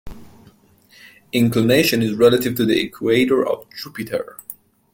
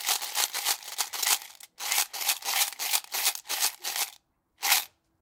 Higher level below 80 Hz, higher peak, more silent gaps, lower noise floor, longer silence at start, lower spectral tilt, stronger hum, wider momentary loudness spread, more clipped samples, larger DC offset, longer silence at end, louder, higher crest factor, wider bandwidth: first, -50 dBFS vs -84 dBFS; first, -2 dBFS vs -6 dBFS; neither; second, -52 dBFS vs -60 dBFS; about the same, 0.05 s vs 0 s; first, -5.5 dB/octave vs 4.5 dB/octave; neither; first, 16 LU vs 7 LU; neither; neither; about the same, 0.4 s vs 0.35 s; first, -18 LUFS vs -27 LUFS; second, 18 dB vs 26 dB; second, 17 kHz vs 19 kHz